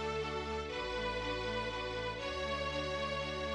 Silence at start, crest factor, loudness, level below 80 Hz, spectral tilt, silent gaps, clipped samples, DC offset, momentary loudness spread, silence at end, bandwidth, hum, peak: 0 s; 12 dB; -38 LUFS; -50 dBFS; -4.5 dB/octave; none; under 0.1%; under 0.1%; 2 LU; 0 s; 11 kHz; none; -26 dBFS